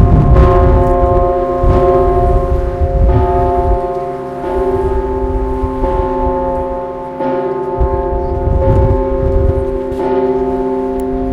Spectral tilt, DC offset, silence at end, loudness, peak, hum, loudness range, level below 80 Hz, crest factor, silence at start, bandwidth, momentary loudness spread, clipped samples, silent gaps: -10 dB/octave; under 0.1%; 0 s; -14 LUFS; 0 dBFS; none; 5 LU; -16 dBFS; 12 dB; 0 s; 5.6 kHz; 8 LU; 0.1%; none